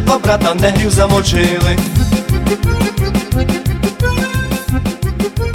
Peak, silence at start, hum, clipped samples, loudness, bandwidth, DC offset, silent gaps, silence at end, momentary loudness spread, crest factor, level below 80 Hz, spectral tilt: 0 dBFS; 0 s; none; under 0.1%; -14 LUFS; 17.5 kHz; under 0.1%; none; 0 s; 6 LU; 12 dB; -22 dBFS; -5.5 dB/octave